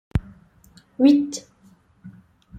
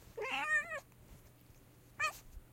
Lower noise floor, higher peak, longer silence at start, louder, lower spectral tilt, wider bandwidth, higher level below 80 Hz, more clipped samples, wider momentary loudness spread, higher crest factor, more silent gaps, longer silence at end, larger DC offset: second, -56 dBFS vs -62 dBFS; first, -4 dBFS vs -24 dBFS; first, 0.15 s vs 0 s; first, -20 LUFS vs -37 LUFS; first, -6.5 dB/octave vs -2 dB/octave; second, 9.2 kHz vs 16.5 kHz; first, -42 dBFS vs -62 dBFS; neither; about the same, 19 LU vs 19 LU; about the same, 20 dB vs 18 dB; neither; about the same, 0 s vs 0 s; neither